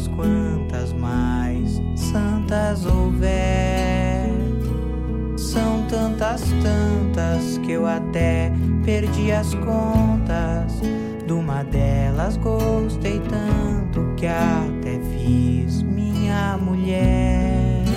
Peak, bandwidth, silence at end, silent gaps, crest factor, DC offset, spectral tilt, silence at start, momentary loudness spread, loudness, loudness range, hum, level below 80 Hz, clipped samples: -6 dBFS; 15.5 kHz; 0 s; none; 14 dB; under 0.1%; -7 dB/octave; 0 s; 5 LU; -21 LUFS; 1 LU; none; -26 dBFS; under 0.1%